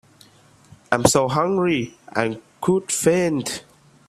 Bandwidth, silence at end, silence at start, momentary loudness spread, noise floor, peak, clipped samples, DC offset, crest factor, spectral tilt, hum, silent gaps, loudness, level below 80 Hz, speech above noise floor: 15 kHz; 0.45 s; 0.9 s; 9 LU; -52 dBFS; 0 dBFS; under 0.1%; under 0.1%; 22 dB; -4.5 dB/octave; none; none; -21 LUFS; -52 dBFS; 32 dB